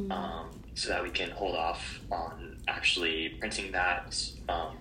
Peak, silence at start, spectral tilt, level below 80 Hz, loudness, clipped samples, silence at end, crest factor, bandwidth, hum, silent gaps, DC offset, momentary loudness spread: -14 dBFS; 0 s; -2.5 dB/octave; -48 dBFS; -32 LUFS; under 0.1%; 0 s; 20 dB; 16 kHz; none; none; under 0.1%; 10 LU